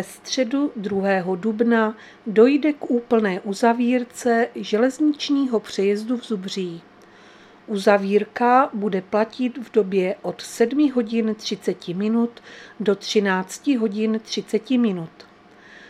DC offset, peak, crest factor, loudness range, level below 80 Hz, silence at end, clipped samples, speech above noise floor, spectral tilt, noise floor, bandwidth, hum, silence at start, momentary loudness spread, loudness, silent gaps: under 0.1%; -2 dBFS; 20 dB; 3 LU; -70 dBFS; 0.05 s; under 0.1%; 27 dB; -5.5 dB/octave; -48 dBFS; 13.5 kHz; none; 0 s; 9 LU; -21 LUFS; none